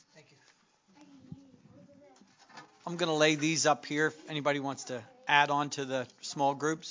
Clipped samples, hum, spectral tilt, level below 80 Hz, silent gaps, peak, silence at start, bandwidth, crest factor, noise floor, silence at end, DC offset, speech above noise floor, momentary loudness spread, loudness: under 0.1%; none; -3.5 dB/octave; -80 dBFS; none; -10 dBFS; 0.15 s; 7.8 kHz; 24 dB; -66 dBFS; 0 s; under 0.1%; 36 dB; 15 LU; -30 LUFS